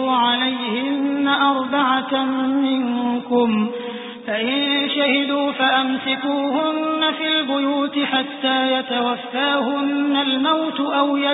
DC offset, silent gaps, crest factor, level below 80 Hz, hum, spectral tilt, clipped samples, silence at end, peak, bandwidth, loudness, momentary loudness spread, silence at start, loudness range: under 0.1%; none; 14 dB; -70 dBFS; none; -9 dB/octave; under 0.1%; 0 s; -4 dBFS; 4 kHz; -19 LUFS; 4 LU; 0 s; 1 LU